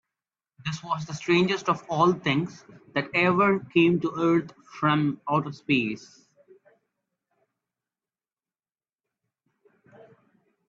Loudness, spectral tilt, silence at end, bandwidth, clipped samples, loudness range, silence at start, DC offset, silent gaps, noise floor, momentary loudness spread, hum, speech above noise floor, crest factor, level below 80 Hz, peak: -25 LUFS; -6 dB/octave; 4.65 s; 7.6 kHz; under 0.1%; 8 LU; 0.65 s; under 0.1%; none; under -90 dBFS; 12 LU; none; over 65 dB; 20 dB; -66 dBFS; -8 dBFS